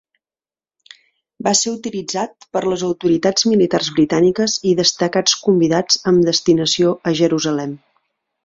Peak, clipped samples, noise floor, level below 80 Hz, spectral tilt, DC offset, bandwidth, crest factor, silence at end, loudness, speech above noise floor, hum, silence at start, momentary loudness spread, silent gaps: 0 dBFS; under 0.1%; under -90 dBFS; -56 dBFS; -4 dB/octave; under 0.1%; 7.8 kHz; 16 dB; 0.7 s; -16 LUFS; over 74 dB; none; 1.4 s; 9 LU; none